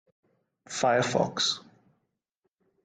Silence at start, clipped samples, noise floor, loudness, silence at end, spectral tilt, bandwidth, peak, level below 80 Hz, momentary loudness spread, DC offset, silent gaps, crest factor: 0.7 s; under 0.1%; -80 dBFS; -27 LUFS; 1.25 s; -3 dB/octave; 9.6 kHz; -10 dBFS; -70 dBFS; 11 LU; under 0.1%; none; 20 dB